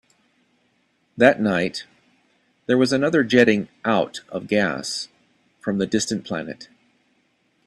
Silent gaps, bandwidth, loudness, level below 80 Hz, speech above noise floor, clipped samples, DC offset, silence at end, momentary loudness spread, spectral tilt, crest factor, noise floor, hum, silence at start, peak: none; 12 kHz; -21 LUFS; -62 dBFS; 46 dB; under 0.1%; under 0.1%; 1 s; 16 LU; -4.5 dB/octave; 22 dB; -66 dBFS; none; 1.15 s; 0 dBFS